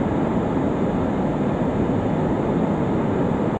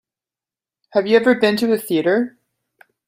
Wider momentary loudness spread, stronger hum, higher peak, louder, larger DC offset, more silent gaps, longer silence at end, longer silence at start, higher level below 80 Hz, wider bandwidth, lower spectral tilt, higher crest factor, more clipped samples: second, 1 LU vs 7 LU; neither; second, -8 dBFS vs -2 dBFS; second, -22 LUFS vs -17 LUFS; neither; neither; second, 0 s vs 0.8 s; second, 0 s vs 0.95 s; first, -38 dBFS vs -64 dBFS; second, 8.6 kHz vs 16 kHz; first, -9 dB/octave vs -5 dB/octave; second, 12 dB vs 18 dB; neither